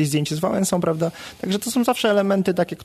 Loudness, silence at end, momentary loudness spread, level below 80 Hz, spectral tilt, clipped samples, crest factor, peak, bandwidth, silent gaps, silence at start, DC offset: -21 LUFS; 0 s; 7 LU; -58 dBFS; -5 dB/octave; under 0.1%; 14 dB; -6 dBFS; 14 kHz; none; 0 s; under 0.1%